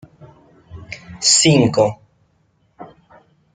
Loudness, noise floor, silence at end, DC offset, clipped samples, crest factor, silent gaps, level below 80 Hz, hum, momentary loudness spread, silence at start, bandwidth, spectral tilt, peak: -14 LUFS; -61 dBFS; 0.7 s; under 0.1%; under 0.1%; 18 dB; none; -54 dBFS; none; 23 LU; 0.75 s; 9.6 kHz; -3.5 dB/octave; -2 dBFS